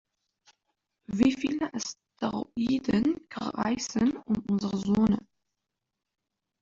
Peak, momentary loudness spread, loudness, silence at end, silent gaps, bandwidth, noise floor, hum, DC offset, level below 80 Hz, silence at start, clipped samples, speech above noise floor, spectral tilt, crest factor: -10 dBFS; 9 LU; -29 LUFS; 1.45 s; none; 7.6 kHz; -86 dBFS; none; under 0.1%; -58 dBFS; 1.1 s; under 0.1%; 58 dB; -5.5 dB/octave; 20 dB